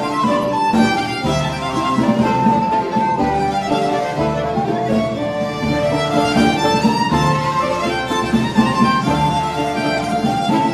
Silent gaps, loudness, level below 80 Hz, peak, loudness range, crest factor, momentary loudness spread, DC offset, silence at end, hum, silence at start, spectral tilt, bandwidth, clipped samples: none; -17 LUFS; -40 dBFS; -2 dBFS; 2 LU; 16 dB; 4 LU; under 0.1%; 0 s; none; 0 s; -5.5 dB/octave; 14 kHz; under 0.1%